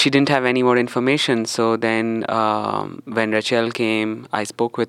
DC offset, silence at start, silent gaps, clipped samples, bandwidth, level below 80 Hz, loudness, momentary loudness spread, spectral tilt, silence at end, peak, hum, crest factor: under 0.1%; 0 s; none; under 0.1%; 14 kHz; -70 dBFS; -19 LUFS; 8 LU; -4.5 dB/octave; 0 s; -2 dBFS; none; 18 dB